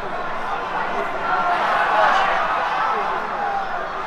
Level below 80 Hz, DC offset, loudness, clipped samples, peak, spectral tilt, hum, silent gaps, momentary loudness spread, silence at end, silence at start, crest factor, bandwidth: -44 dBFS; under 0.1%; -20 LUFS; under 0.1%; -4 dBFS; -3.5 dB/octave; none; none; 9 LU; 0 s; 0 s; 16 dB; 13.5 kHz